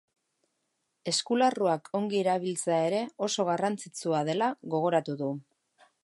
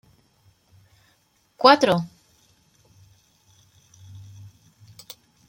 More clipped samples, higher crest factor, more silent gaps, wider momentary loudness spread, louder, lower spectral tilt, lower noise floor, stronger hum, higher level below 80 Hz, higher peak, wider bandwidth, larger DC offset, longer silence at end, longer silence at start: neither; second, 18 dB vs 26 dB; neither; second, 8 LU vs 30 LU; second, -29 LUFS vs -18 LUFS; about the same, -4.5 dB/octave vs -5 dB/octave; first, -79 dBFS vs -64 dBFS; neither; second, -82 dBFS vs -66 dBFS; second, -12 dBFS vs -2 dBFS; second, 11.5 kHz vs 16.5 kHz; neither; second, 0.65 s vs 3.45 s; second, 1.05 s vs 1.6 s